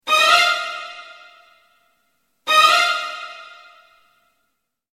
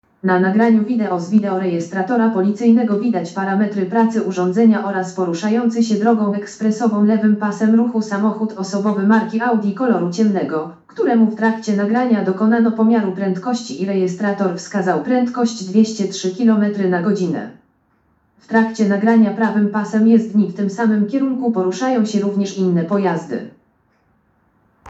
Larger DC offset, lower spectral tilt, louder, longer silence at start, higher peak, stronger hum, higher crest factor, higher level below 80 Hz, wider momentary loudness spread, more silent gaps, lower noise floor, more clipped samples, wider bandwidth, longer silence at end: neither; second, 2 dB/octave vs -7 dB/octave; about the same, -15 LUFS vs -17 LUFS; second, 0.05 s vs 0.25 s; about the same, -2 dBFS vs 0 dBFS; neither; about the same, 20 dB vs 16 dB; first, -64 dBFS vs -70 dBFS; first, 22 LU vs 7 LU; neither; first, -74 dBFS vs -60 dBFS; neither; first, 16 kHz vs 8 kHz; first, 1.5 s vs 0 s